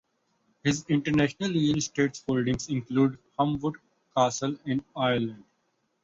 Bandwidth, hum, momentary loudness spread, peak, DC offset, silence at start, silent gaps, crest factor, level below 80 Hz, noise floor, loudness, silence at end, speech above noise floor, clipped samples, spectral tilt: 8 kHz; none; 6 LU; -10 dBFS; under 0.1%; 0.65 s; none; 18 dB; -56 dBFS; -74 dBFS; -28 LUFS; 0.65 s; 47 dB; under 0.1%; -5.5 dB/octave